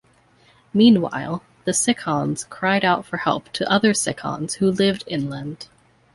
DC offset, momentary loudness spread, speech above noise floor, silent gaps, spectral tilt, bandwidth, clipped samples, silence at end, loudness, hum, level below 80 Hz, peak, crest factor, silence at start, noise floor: under 0.1%; 13 LU; 36 dB; none; -4 dB/octave; 11.5 kHz; under 0.1%; 0.5 s; -20 LUFS; none; -58 dBFS; -2 dBFS; 18 dB; 0.75 s; -56 dBFS